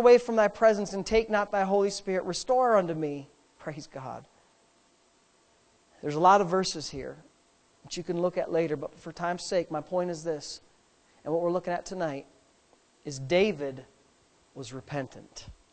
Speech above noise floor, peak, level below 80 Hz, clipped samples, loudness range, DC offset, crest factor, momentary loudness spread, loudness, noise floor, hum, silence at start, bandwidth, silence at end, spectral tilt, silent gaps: 38 dB; -8 dBFS; -58 dBFS; under 0.1%; 6 LU; under 0.1%; 22 dB; 19 LU; -28 LUFS; -65 dBFS; none; 0 s; 9 kHz; 0.2 s; -5 dB/octave; none